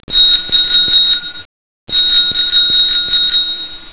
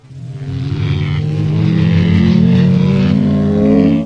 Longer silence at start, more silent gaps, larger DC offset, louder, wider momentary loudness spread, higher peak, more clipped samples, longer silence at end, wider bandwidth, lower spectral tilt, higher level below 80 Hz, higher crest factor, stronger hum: about the same, 0.1 s vs 0.1 s; first, 1.45-1.87 s vs none; first, 2% vs under 0.1%; first, -7 LUFS vs -13 LUFS; about the same, 8 LU vs 10 LU; about the same, 0 dBFS vs 0 dBFS; neither; about the same, 0.05 s vs 0 s; second, 4 kHz vs 7 kHz; second, -5.5 dB/octave vs -9 dB/octave; about the same, -40 dBFS vs -36 dBFS; about the same, 10 dB vs 12 dB; neither